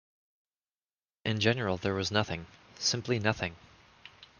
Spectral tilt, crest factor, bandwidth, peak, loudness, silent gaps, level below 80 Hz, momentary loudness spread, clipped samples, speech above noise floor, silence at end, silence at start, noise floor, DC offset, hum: -4 dB/octave; 22 dB; 10 kHz; -12 dBFS; -31 LUFS; none; -64 dBFS; 10 LU; under 0.1%; over 59 dB; 0.15 s; 1.25 s; under -90 dBFS; under 0.1%; none